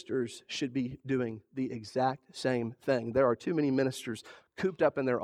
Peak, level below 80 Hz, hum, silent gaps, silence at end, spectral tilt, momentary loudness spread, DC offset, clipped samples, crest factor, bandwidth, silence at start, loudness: -12 dBFS; -68 dBFS; none; none; 0 s; -6 dB/octave; 9 LU; under 0.1%; under 0.1%; 18 dB; 13 kHz; 0.05 s; -32 LUFS